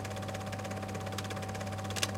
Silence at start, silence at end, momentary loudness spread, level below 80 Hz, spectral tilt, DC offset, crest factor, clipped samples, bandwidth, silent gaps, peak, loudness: 0 s; 0 s; 2 LU; -60 dBFS; -4 dB/octave; under 0.1%; 24 dB; under 0.1%; 17 kHz; none; -12 dBFS; -38 LUFS